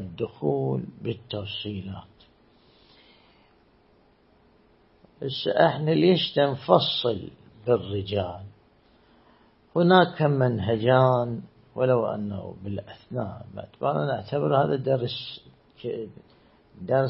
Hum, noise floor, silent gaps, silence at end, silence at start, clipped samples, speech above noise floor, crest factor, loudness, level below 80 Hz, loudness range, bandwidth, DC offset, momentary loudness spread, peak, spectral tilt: none; -60 dBFS; none; 0 s; 0 s; under 0.1%; 36 dB; 24 dB; -25 LUFS; -62 dBFS; 13 LU; 5.8 kHz; under 0.1%; 17 LU; -2 dBFS; -11 dB/octave